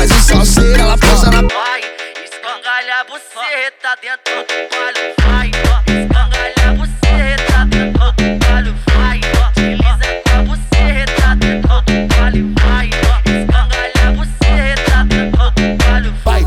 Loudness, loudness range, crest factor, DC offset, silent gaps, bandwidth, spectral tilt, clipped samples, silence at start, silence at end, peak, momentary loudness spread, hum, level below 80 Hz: -13 LUFS; 4 LU; 10 dB; under 0.1%; none; 16 kHz; -4.5 dB/octave; under 0.1%; 0 s; 0 s; 0 dBFS; 8 LU; none; -12 dBFS